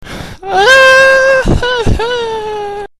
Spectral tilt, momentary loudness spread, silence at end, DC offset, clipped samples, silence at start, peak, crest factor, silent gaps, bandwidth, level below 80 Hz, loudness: -4 dB/octave; 16 LU; 0.15 s; under 0.1%; 0.6%; 0 s; 0 dBFS; 10 dB; none; 14 kHz; -24 dBFS; -8 LUFS